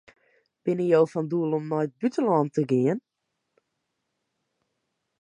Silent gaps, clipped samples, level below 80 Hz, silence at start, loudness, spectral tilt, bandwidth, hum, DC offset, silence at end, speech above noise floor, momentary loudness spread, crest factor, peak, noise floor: none; under 0.1%; -78 dBFS; 0.65 s; -25 LUFS; -8.5 dB/octave; 9.8 kHz; none; under 0.1%; 2.2 s; 56 dB; 7 LU; 18 dB; -8 dBFS; -80 dBFS